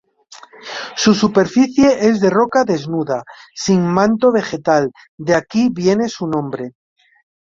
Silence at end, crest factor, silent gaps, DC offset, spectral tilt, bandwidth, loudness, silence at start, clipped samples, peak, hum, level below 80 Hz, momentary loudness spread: 0.7 s; 14 dB; 5.09-5.18 s; under 0.1%; -5.5 dB/octave; 7.6 kHz; -16 LUFS; 0.3 s; under 0.1%; -2 dBFS; none; -52 dBFS; 14 LU